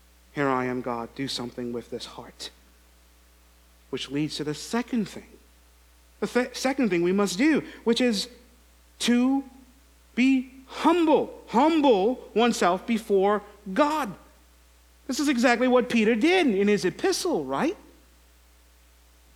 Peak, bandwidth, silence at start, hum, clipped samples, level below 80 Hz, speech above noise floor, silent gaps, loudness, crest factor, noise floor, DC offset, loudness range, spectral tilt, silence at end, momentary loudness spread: -6 dBFS; 16.5 kHz; 0.35 s; none; under 0.1%; -56 dBFS; 32 dB; none; -25 LUFS; 20 dB; -57 dBFS; under 0.1%; 10 LU; -4.5 dB/octave; 1.6 s; 14 LU